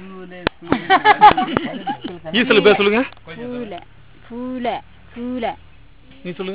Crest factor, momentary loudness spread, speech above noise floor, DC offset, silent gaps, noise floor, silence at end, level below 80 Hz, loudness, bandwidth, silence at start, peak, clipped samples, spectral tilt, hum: 18 dB; 22 LU; 29 dB; 0.6%; none; -46 dBFS; 0 s; -48 dBFS; -16 LUFS; 4 kHz; 0 s; 0 dBFS; under 0.1%; -8.5 dB/octave; none